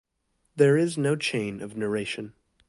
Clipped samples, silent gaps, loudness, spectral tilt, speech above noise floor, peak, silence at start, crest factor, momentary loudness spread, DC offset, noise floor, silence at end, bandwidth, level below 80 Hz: under 0.1%; none; -26 LUFS; -5.5 dB/octave; 49 dB; -6 dBFS; 0.55 s; 20 dB; 15 LU; under 0.1%; -74 dBFS; 0.4 s; 11.5 kHz; -66 dBFS